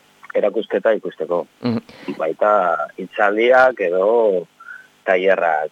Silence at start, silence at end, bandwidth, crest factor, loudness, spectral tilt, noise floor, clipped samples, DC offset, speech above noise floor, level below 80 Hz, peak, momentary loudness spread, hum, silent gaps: 0.25 s; 0.05 s; 8 kHz; 16 dB; -18 LUFS; -6.5 dB/octave; -40 dBFS; under 0.1%; under 0.1%; 23 dB; -70 dBFS; -2 dBFS; 13 LU; none; none